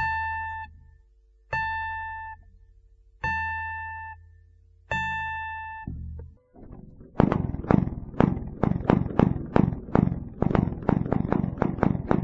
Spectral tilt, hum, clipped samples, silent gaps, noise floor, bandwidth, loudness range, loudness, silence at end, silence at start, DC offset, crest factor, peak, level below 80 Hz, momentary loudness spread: -9 dB/octave; none; under 0.1%; none; -58 dBFS; 7.6 kHz; 9 LU; -27 LUFS; 0 s; 0 s; under 0.1%; 26 dB; -2 dBFS; -40 dBFS; 18 LU